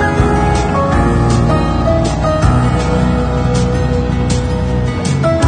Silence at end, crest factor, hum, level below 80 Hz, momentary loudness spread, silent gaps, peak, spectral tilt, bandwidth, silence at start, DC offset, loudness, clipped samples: 0 s; 12 dB; none; -20 dBFS; 3 LU; none; 0 dBFS; -6.5 dB/octave; 10 kHz; 0 s; under 0.1%; -14 LUFS; under 0.1%